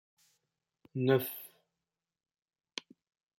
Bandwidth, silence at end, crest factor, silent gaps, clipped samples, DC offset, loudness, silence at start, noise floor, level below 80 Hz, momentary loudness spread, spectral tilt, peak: 16.5 kHz; 1.9 s; 22 dB; none; under 0.1%; under 0.1%; -34 LUFS; 0.95 s; under -90 dBFS; -82 dBFS; 17 LU; -6 dB/octave; -16 dBFS